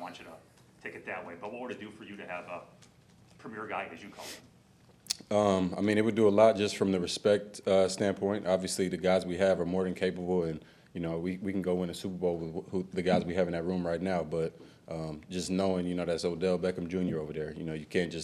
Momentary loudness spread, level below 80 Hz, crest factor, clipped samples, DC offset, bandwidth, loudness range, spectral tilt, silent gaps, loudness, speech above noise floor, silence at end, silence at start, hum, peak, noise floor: 17 LU; -62 dBFS; 20 dB; under 0.1%; under 0.1%; 14 kHz; 15 LU; -5.5 dB/octave; none; -31 LUFS; 30 dB; 0 s; 0 s; none; -12 dBFS; -61 dBFS